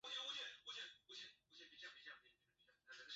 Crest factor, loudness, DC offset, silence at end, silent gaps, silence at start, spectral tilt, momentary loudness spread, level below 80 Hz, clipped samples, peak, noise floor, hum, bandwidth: 18 dB; -53 LUFS; under 0.1%; 0 s; none; 0.05 s; 3.5 dB/octave; 15 LU; under -90 dBFS; under 0.1%; -38 dBFS; -80 dBFS; none; 8 kHz